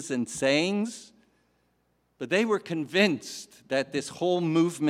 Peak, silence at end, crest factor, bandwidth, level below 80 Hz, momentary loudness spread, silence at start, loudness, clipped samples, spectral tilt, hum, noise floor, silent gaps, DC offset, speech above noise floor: -8 dBFS; 0 s; 20 dB; 14.5 kHz; -72 dBFS; 13 LU; 0 s; -27 LUFS; under 0.1%; -4.5 dB/octave; 60 Hz at -60 dBFS; -71 dBFS; none; under 0.1%; 44 dB